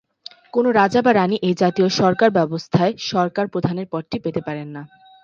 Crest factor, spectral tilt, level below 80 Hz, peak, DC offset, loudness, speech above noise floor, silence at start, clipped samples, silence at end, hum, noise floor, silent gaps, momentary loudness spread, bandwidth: 18 dB; -6 dB/octave; -58 dBFS; -2 dBFS; under 0.1%; -19 LUFS; 25 dB; 0.55 s; under 0.1%; 0.35 s; none; -44 dBFS; none; 11 LU; 7.6 kHz